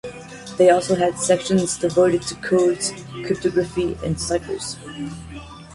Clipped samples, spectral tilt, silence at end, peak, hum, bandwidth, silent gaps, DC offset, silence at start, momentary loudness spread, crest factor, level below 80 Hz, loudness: under 0.1%; -4.5 dB/octave; 0 s; -4 dBFS; none; 11.5 kHz; none; under 0.1%; 0.05 s; 16 LU; 18 dB; -46 dBFS; -20 LUFS